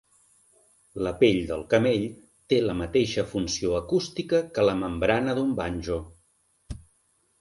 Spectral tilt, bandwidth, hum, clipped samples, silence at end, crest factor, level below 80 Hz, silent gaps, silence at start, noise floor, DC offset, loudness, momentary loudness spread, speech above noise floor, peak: -5.5 dB/octave; 11.5 kHz; none; under 0.1%; 0.65 s; 20 dB; -48 dBFS; none; 0.95 s; -68 dBFS; under 0.1%; -26 LUFS; 12 LU; 43 dB; -8 dBFS